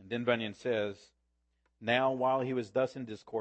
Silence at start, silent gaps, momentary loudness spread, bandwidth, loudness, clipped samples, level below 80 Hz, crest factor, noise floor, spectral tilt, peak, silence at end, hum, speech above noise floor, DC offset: 0 s; none; 11 LU; 8.6 kHz; -33 LUFS; under 0.1%; -74 dBFS; 20 dB; -78 dBFS; -6 dB/octave; -14 dBFS; 0 s; none; 45 dB; under 0.1%